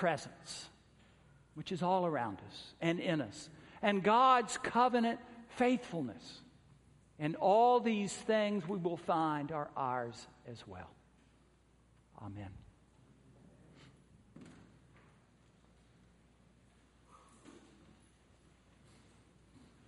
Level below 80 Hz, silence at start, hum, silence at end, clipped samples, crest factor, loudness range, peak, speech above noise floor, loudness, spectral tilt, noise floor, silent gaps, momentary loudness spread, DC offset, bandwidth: -70 dBFS; 0 s; none; 2.35 s; under 0.1%; 22 dB; 23 LU; -14 dBFS; 34 dB; -34 LUFS; -5 dB/octave; -68 dBFS; none; 24 LU; under 0.1%; 11.5 kHz